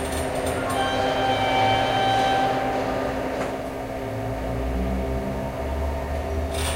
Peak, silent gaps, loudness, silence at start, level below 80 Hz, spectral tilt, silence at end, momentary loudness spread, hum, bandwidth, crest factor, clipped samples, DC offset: -10 dBFS; none; -24 LUFS; 0 s; -34 dBFS; -5 dB/octave; 0 s; 8 LU; none; 16 kHz; 14 dB; under 0.1%; under 0.1%